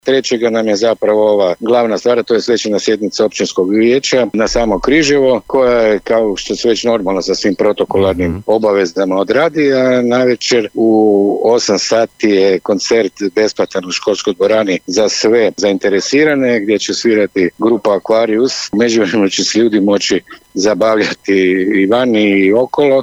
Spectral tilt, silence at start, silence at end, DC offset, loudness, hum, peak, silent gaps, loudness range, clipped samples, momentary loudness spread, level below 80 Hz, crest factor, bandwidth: -4 dB/octave; 0.05 s; 0 s; under 0.1%; -12 LUFS; none; -2 dBFS; none; 2 LU; under 0.1%; 4 LU; -42 dBFS; 10 dB; 10.5 kHz